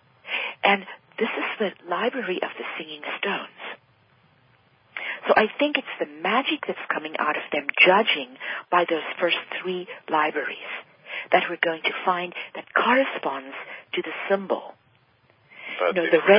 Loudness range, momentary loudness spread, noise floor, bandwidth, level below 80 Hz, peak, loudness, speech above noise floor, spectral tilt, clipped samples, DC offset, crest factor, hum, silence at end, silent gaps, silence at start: 6 LU; 14 LU; -61 dBFS; 5.2 kHz; -76 dBFS; -2 dBFS; -24 LUFS; 37 dB; -8.5 dB/octave; under 0.1%; under 0.1%; 22 dB; none; 0 s; none; 0.25 s